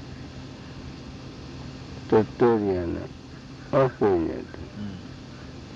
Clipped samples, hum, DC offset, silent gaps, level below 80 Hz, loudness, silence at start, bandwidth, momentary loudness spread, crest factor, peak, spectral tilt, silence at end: under 0.1%; none; under 0.1%; none; -50 dBFS; -25 LUFS; 0 s; 7.8 kHz; 19 LU; 18 dB; -10 dBFS; -8 dB/octave; 0 s